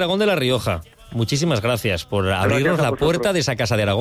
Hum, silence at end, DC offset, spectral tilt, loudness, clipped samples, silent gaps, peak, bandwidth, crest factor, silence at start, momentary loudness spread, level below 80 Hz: none; 0 s; under 0.1%; -5 dB/octave; -20 LUFS; under 0.1%; none; -8 dBFS; 16 kHz; 12 dB; 0 s; 6 LU; -44 dBFS